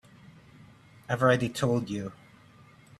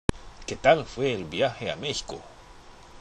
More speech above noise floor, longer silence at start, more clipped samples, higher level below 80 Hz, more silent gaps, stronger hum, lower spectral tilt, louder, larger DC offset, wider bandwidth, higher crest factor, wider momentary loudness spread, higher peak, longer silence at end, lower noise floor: first, 28 dB vs 22 dB; first, 0.6 s vs 0.1 s; neither; second, -62 dBFS vs -44 dBFS; neither; neither; first, -6 dB/octave vs -4.5 dB/octave; about the same, -28 LUFS vs -27 LUFS; neither; first, 13.5 kHz vs 11 kHz; about the same, 22 dB vs 24 dB; second, 12 LU vs 18 LU; second, -10 dBFS vs -4 dBFS; first, 0.85 s vs 0 s; first, -55 dBFS vs -48 dBFS